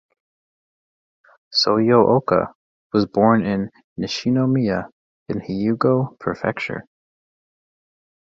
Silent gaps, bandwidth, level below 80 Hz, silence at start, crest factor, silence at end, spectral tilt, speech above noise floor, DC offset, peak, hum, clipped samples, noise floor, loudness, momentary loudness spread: 2.55-2.90 s, 3.84-3.96 s, 4.92-5.26 s; 7.6 kHz; -54 dBFS; 1.5 s; 20 dB; 1.45 s; -6.5 dB/octave; over 71 dB; under 0.1%; -2 dBFS; none; under 0.1%; under -90 dBFS; -20 LUFS; 14 LU